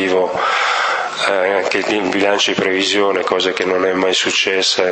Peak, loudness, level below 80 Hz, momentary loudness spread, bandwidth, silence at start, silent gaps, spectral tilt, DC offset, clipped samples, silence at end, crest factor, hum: 0 dBFS; -15 LUFS; -62 dBFS; 3 LU; 8.8 kHz; 0 s; none; -2.5 dB/octave; under 0.1%; under 0.1%; 0 s; 16 dB; none